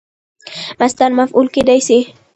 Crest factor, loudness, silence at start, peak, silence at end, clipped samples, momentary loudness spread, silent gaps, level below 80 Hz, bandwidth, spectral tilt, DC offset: 14 dB; -13 LUFS; 0.45 s; 0 dBFS; 0.25 s; under 0.1%; 15 LU; none; -50 dBFS; 10.5 kHz; -3.5 dB/octave; under 0.1%